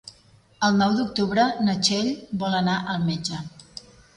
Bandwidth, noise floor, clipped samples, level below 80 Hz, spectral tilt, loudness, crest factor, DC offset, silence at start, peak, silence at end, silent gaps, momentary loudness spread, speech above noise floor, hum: 11.5 kHz; -56 dBFS; under 0.1%; -58 dBFS; -4.5 dB/octave; -23 LUFS; 16 dB; under 0.1%; 0.05 s; -8 dBFS; 0.55 s; none; 16 LU; 33 dB; none